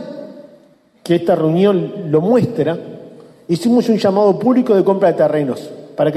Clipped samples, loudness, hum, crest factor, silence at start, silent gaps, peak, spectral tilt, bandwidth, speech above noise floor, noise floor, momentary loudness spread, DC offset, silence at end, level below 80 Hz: under 0.1%; -15 LUFS; none; 14 dB; 0 s; none; -2 dBFS; -7.5 dB/octave; 14 kHz; 36 dB; -50 dBFS; 18 LU; under 0.1%; 0 s; -60 dBFS